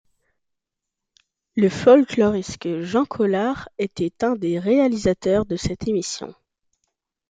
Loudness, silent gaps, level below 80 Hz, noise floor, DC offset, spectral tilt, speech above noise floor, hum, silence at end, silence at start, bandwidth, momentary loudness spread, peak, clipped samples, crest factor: -21 LUFS; none; -50 dBFS; -83 dBFS; under 0.1%; -6 dB/octave; 63 dB; none; 0.95 s; 1.55 s; 9.4 kHz; 13 LU; -2 dBFS; under 0.1%; 20 dB